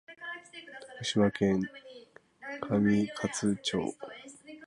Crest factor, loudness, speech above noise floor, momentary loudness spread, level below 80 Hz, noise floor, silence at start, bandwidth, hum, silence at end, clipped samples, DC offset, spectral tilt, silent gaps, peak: 18 dB; -31 LUFS; 26 dB; 20 LU; -62 dBFS; -55 dBFS; 0.1 s; 11 kHz; none; 0 s; under 0.1%; under 0.1%; -5 dB/octave; none; -14 dBFS